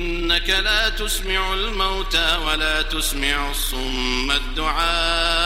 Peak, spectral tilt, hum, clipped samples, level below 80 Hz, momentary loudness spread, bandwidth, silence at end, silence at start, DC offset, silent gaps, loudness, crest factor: -4 dBFS; -2 dB/octave; none; under 0.1%; -26 dBFS; 5 LU; 16.5 kHz; 0 s; 0 s; under 0.1%; none; -20 LUFS; 16 dB